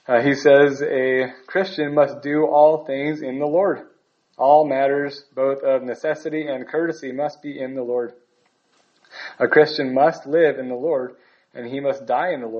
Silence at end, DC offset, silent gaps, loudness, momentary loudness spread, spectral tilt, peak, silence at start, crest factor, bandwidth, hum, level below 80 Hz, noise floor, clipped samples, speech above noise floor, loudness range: 0 s; under 0.1%; none; -20 LUFS; 13 LU; -6 dB/octave; 0 dBFS; 0.1 s; 20 dB; 7 kHz; none; -72 dBFS; -64 dBFS; under 0.1%; 45 dB; 7 LU